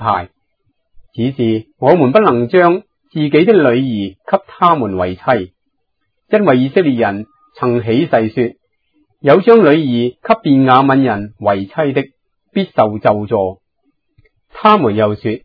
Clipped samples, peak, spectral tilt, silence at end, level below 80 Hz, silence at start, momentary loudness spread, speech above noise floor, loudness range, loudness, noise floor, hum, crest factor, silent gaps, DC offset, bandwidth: 0.2%; 0 dBFS; -10 dB/octave; 0.05 s; -54 dBFS; 0 s; 11 LU; 58 dB; 4 LU; -13 LUFS; -70 dBFS; none; 14 dB; none; under 0.1%; 5.4 kHz